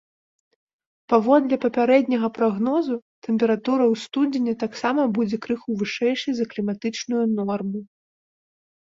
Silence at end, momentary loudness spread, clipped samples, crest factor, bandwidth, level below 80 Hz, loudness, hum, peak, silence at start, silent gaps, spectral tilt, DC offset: 1.15 s; 9 LU; under 0.1%; 20 dB; 7.6 kHz; -68 dBFS; -22 LUFS; none; -4 dBFS; 1.1 s; 3.02-3.22 s; -6 dB/octave; under 0.1%